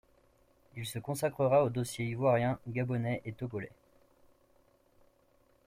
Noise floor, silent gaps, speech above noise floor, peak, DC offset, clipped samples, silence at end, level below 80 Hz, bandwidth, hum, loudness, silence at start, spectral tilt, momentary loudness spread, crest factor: -68 dBFS; none; 36 dB; -16 dBFS; under 0.1%; under 0.1%; 2 s; -66 dBFS; 15.5 kHz; none; -33 LUFS; 0.75 s; -6.5 dB/octave; 14 LU; 18 dB